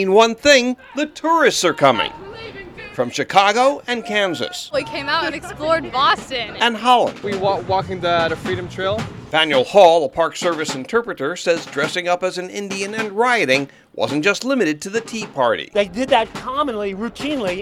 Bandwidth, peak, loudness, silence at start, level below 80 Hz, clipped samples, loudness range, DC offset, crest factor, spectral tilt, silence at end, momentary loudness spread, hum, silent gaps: 16 kHz; 0 dBFS; -18 LUFS; 0 s; -50 dBFS; under 0.1%; 3 LU; under 0.1%; 18 dB; -3.5 dB/octave; 0 s; 11 LU; none; none